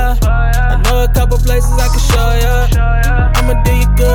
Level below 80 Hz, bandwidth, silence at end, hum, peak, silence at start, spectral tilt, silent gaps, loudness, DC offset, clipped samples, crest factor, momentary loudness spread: -10 dBFS; 17 kHz; 0 s; none; 0 dBFS; 0 s; -5 dB/octave; none; -13 LUFS; under 0.1%; under 0.1%; 8 dB; 1 LU